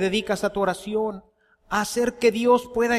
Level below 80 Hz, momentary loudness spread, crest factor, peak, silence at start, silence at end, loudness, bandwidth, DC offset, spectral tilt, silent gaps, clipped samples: -52 dBFS; 7 LU; 16 dB; -6 dBFS; 0 s; 0 s; -23 LUFS; 15 kHz; under 0.1%; -4 dB/octave; none; under 0.1%